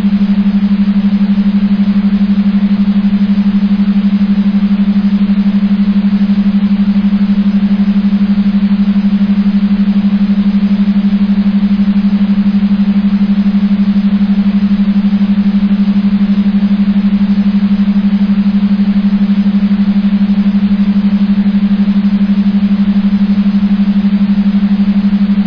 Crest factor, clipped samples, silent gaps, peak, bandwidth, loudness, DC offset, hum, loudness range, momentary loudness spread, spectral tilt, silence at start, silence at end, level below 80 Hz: 8 dB; under 0.1%; none; -2 dBFS; 5.4 kHz; -10 LUFS; under 0.1%; none; 0 LU; 0 LU; -10 dB/octave; 0 s; 0 s; -34 dBFS